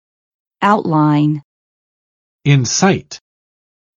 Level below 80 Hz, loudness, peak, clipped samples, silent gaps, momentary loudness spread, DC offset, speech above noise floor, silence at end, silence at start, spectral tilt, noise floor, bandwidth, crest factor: -54 dBFS; -15 LUFS; 0 dBFS; under 0.1%; 1.44-2.39 s; 12 LU; under 0.1%; over 77 dB; 0.85 s; 0.6 s; -5 dB/octave; under -90 dBFS; 7.6 kHz; 18 dB